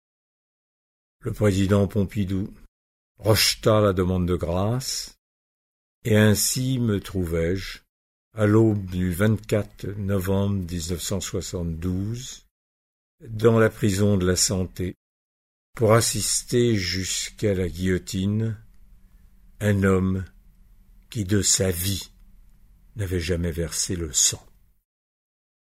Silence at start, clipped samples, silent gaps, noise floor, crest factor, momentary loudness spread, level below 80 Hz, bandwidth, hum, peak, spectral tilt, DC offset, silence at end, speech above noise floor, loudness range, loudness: 1.25 s; under 0.1%; 2.68-3.15 s, 5.18-6.02 s, 7.89-8.31 s, 12.51-13.18 s, 14.97-15.73 s; -52 dBFS; 20 dB; 14 LU; -44 dBFS; 16 kHz; none; -4 dBFS; -4.5 dB/octave; under 0.1%; 1.35 s; 30 dB; 4 LU; -23 LUFS